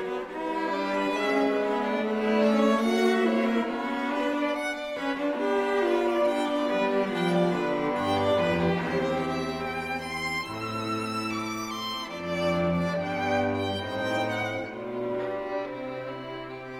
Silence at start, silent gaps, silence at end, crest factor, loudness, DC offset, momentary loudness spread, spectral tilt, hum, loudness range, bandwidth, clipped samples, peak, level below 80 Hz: 0 s; none; 0 s; 14 dB; -27 LUFS; under 0.1%; 9 LU; -5.5 dB/octave; none; 5 LU; 16 kHz; under 0.1%; -12 dBFS; -58 dBFS